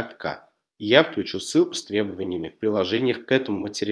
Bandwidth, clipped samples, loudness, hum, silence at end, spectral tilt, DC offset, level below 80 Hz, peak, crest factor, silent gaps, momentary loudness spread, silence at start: 11 kHz; under 0.1%; -24 LUFS; none; 0 s; -4.5 dB/octave; under 0.1%; -64 dBFS; 0 dBFS; 24 dB; none; 14 LU; 0 s